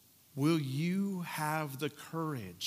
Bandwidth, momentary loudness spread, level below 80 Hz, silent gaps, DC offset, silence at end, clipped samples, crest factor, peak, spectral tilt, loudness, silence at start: 16 kHz; 8 LU; -80 dBFS; none; under 0.1%; 0 s; under 0.1%; 16 dB; -18 dBFS; -6 dB/octave; -35 LUFS; 0.35 s